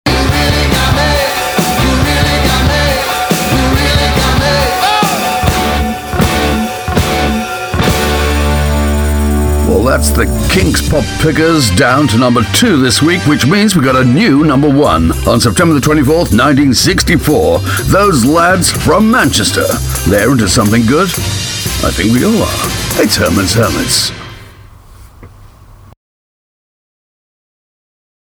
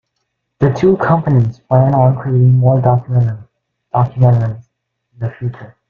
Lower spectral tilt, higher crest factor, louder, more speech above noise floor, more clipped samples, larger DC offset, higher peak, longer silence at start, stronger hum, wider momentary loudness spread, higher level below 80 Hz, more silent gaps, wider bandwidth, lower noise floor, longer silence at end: second, -4.5 dB/octave vs -10.5 dB/octave; about the same, 10 dB vs 12 dB; first, -10 LUFS vs -13 LUFS; second, 28 dB vs 59 dB; neither; neither; about the same, 0 dBFS vs -2 dBFS; second, 0.05 s vs 0.6 s; neither; second, 5 LU vs 14 LU; first, -20 dBFS vs -46 dBFS; neither; first, over 20 kHz vs 4.3 kHz; second, -37 dBFS vs -71 dBFS; first, 2.85 s vs 0.25 s